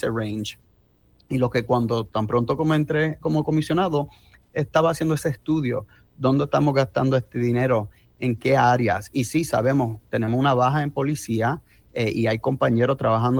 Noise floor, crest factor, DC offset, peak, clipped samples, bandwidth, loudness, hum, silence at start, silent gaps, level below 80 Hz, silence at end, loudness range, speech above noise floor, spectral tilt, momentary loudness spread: -59 dBFS; 16 dB; under 0.1%; -6 dBFS; under 0.1%; 19 kHz; -22 LUFS; none; 0 s; none; -52 dBFS; 0 s; 2 LU; 38 dB; -7 dB/octave; 7 LU